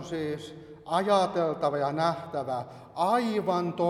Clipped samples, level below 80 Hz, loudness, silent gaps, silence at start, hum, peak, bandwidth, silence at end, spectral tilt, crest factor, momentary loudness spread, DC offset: under 0.1%; -66 dBFS; -28 LUFS; none; 0 s; none; -12 dBFS; 14.5 kHz; 0 s; -6 dB/octave; 18 dB; 13 LU; under 0.1%